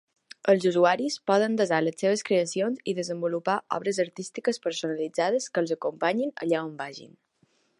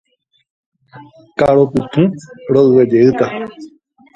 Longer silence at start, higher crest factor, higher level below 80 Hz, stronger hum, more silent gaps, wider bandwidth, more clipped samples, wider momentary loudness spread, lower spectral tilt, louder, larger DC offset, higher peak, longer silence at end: second, 0.45 s vs 0.95 s; about the same, 18 dB vs 14 dB; second, -80 dBFS vs -48 dBFS; neither; neither; first, 11.5 kHz vs 7.8 kHz; neither; second, 8 LU vs 17 LU; second, -4.5 dB/octave vs -8.5 dB/octave; second, -26 LUFS vs -13 LUFS; neither; second, -8 dBFS vs 0 dBFS; first, 0.7 s vs 0.5 s